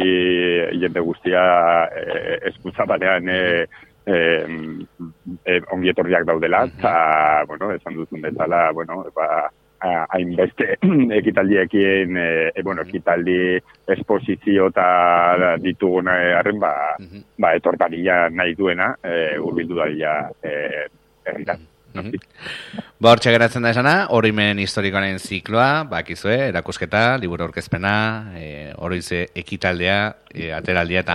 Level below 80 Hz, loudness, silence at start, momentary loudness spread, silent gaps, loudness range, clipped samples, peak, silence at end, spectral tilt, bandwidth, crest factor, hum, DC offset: -52 dBFS; -19 LUFS; 0 s; 14 LU; none; 5 LU; under 0.1%; 0 dBFS; 0 s; -6 dB/octave; 12.5 kHz; 18 dB; none; under 0.1%